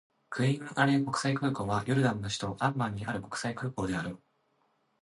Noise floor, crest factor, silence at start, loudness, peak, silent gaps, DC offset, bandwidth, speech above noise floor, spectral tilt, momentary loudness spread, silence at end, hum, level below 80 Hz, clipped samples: -73 dBFS; 20 dB; 0.3 s; -31 LUFS; -12 dBFS; none; under 0.1%; 11.5 kHz; 43 dB; -5.5 dB/octave; 9 LU; 0.85 s; none; -58 dBFS; under 0.1%